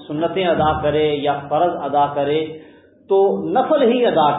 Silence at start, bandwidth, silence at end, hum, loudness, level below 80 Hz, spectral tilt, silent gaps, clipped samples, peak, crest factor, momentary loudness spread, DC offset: 0 s; 4 kHz; 0 s; none; -18 LUFS; -46 dBFS; -11 dB/octave; none; under 0.1%; -4 dBFS; 14 dB; 6 LU; under 0.1%